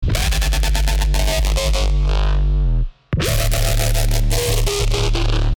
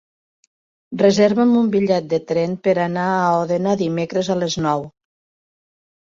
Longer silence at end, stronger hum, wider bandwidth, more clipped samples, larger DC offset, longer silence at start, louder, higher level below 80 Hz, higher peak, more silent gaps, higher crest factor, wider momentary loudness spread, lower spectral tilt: second, 0.05 s vs 1.15 s; neither; first, over 20 kHz vs 7.6 kHz; neither; neither; second, 0 s vs 0.9 s; about the same, -19 LUFS vs -18 LUFS; first, -18 dBFS vs -58 dBFS; about the same, -2 dBFS vs -2 dBFS; neither; about the same, 14 dB vs 18 dB; second, 1 LU vs 7 LU; second, -4 dB/octave vs -6 dB/octave